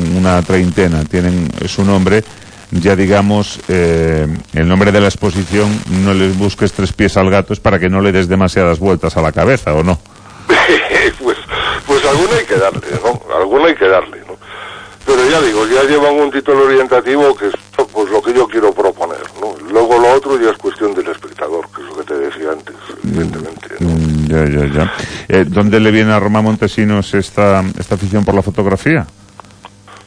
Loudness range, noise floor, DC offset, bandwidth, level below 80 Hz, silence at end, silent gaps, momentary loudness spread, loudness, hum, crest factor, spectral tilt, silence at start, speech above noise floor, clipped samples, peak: 4 LU; -38 dBFS; under 0.1%; 10.5 kHz; -32 dBFS; 0.1 s; none; 11 LU; -12 LUFS; none; 12 dB; -6 dB/octave; 0 s; 26 dB; under 0.1%; 0 dBFS